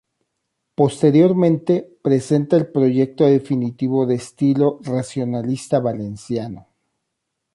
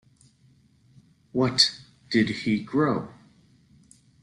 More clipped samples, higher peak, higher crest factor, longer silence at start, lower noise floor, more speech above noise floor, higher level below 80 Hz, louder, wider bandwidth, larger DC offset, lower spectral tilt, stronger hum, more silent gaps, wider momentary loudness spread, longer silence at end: neither; about the same, -4 dBFS vs -4 dBFS; second, 16 dB vs 24 dB; second, 0.8 s vs 1.35 s; first, -77 dBFS vs -60 dBFS; first, 60 dB vs 36 dB; about the same, -60 dBFS vs -62 dBFS; first, -18 LUFS vs -24 LUFS; about the same, 11.5 kHz vs 12 kHz; neither; first, -8 dB/octave vs -4.5 dB/octave; neither; neither; about the same, 11 LU vs 13 LU; second, 0.95 s vs 1.1 s